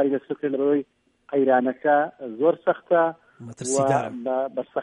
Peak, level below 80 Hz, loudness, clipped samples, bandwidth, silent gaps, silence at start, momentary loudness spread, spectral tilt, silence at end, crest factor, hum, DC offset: -6 dBFS; -72 dBFS; -23 LUFS; under 0.1%; 11 kHz; none; 0 s; 7 LU; -5.5 dB/octave; 0 s; 16 dB; none; under 0.1%